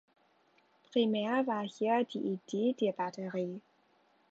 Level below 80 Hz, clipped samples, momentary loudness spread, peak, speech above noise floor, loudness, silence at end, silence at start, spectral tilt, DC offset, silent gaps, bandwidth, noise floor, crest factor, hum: -86 dBFS; under 0.1%; 7 LU; -18 dBFS; 37 dB; -33 LUFS; 0.7 s; 0.9 s; -6 dB/octave; under 0.1%; none; 8 kHz; -70 dBFS; 16 dB; none